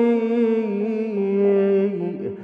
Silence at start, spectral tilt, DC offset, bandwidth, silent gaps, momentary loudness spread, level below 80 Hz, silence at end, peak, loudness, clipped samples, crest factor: 0 s; -10 dB/octave; under 0.1%; 5 kHz; none; 6 LU; -72 dBFS; 0 s; -10 dBFS; -21 LUFS; under 0.1%; 10 dB